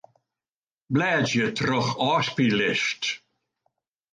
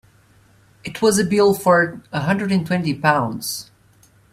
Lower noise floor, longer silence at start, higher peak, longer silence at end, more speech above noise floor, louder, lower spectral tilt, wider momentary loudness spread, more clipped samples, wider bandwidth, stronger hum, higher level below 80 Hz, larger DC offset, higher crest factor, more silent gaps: first, under -90 dBFS vs -54 dBFS; about the same, 0.9 s vs 0.85 s; second, -10 dBFS vs 0 dBFS; first, 0.95 s vs 0.7 s; first, over 66 dB vs 36 dB; second, -24 LUFS vs -18 LUFS; about the same, -4.5 dB/octave vs -5 dB/octave; second, 6 LU vs 11 LU; neither; second, 9.8 kHz vs 16 kHz; neither; second, -64 dBFS vs -56 dBFS; neither; about the same, 16 dB vs 20 dB; neither